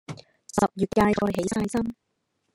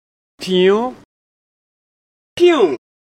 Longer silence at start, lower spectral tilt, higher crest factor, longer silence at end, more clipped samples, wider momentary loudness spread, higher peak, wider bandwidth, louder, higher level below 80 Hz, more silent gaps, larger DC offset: second, 0.1 s vs 0.4 s; about the same, -6 dB/octave vs -5.5 dB/octave; about the same, 20 dB vs 16 dB; first, 0.6 s vs 0.3 s; neither; about the same, 14 LU vs 16 LU; second, -6 dBFS vs -2 dBFS; first, 15.5 kHz vs 11 kHz; second, -25 LUFS vs -15 LUFS; first, -50 dBFS vs -60 dBFS; second, none vs 1.05-2.36 s; neither